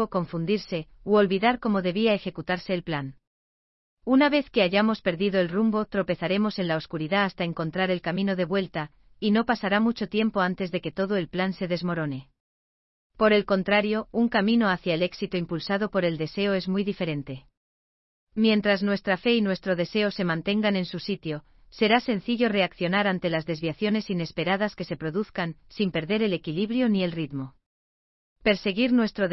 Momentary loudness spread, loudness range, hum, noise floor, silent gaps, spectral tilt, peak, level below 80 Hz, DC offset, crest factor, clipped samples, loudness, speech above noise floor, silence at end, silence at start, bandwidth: 9 LU; 3 LU; none; under -90 dBFS; 3.27-3.97 s, 12.40-13.10 s, 17.57-18.27 s, 27.66-28.36 s; -7.5 dB/octave; -6 dBFS; -56 dBFS; under 0.1%; 18 dB; under 0.1%; -25 LUFS; over 65 dB; 0 s; 0 s; 6 kHz